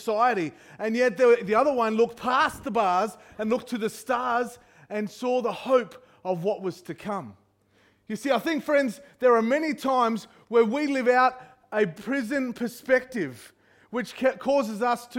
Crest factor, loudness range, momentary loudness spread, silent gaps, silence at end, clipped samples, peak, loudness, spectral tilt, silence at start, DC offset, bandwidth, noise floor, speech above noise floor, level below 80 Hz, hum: 16 dB; 6 LU; 12 LU; none; 0 s; under 0.1%; -8 dBFS; -25 LUFS; -5 dB/octave; 0 s; under 0.1%; 16.5 kHz; -63 dBFS; 38 dB; -66 dBFS; none